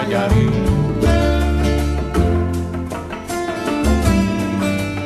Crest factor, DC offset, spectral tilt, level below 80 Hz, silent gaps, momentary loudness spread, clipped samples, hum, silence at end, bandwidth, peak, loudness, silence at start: 14 dB; under 0.1%; -6.5 dB/octave; -22 dBFS; none; 8 LU; under 0.1%; none; 0 s; 13.5 kHz; -4 dBFS; -18 LUFS; 0 s